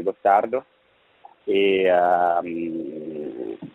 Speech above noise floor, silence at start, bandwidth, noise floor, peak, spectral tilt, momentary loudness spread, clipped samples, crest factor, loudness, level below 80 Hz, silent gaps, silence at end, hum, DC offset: 40 dB; 0 s; 4.1 kHz; -60 dBFS; -4 dBFS; -7 dB/octave; 14 LU; under 0.1%; 18 dB; -22 LUFS; -68 dBFS; none; 0.05 s; none; under 0.1%